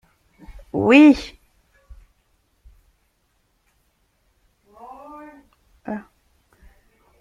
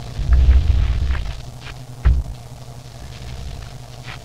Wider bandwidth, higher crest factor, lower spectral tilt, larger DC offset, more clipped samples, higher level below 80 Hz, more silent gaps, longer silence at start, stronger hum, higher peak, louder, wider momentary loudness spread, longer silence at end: second, 7.6 kHz vs 9.2 kHz; first, 22 dB vs 16 dB; about the same, -6 dB/octave vs -6.5 dB/octave; neither; neither; second, -50 dBFS vs -20 dBFS; neither; first, 0.75 s vs 0 s; neither; about the same, -2 dBFS vs -2 dBFS; first, -16 LUFS vs -19 LUFS; first, 30 LU vs 21 LU; first, 1.2 s vs 0 s